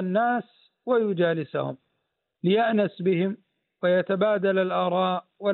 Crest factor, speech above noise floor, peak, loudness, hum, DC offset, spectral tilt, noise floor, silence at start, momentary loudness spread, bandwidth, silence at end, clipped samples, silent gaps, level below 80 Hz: 14 dB; 55 dB; -10 dBFS; -25 LUFS; none; under 0.1%; -5 dB/octave; -78 dBFS; 0 s; 8 LU; 4.3 kHz; 0 s; under 0.1%; none; -78 dBFS